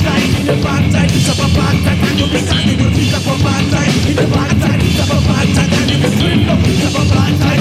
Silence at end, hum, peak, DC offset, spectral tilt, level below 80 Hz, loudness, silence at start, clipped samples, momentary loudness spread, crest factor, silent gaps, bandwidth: 0 s; none; 0 dBFS; under 0.1%; -5.5 dB/octave; -26 dBFS; -12 LUFS; 0 s; under 0.1%; 2 LU; 12 dB; none; 15.5 kHz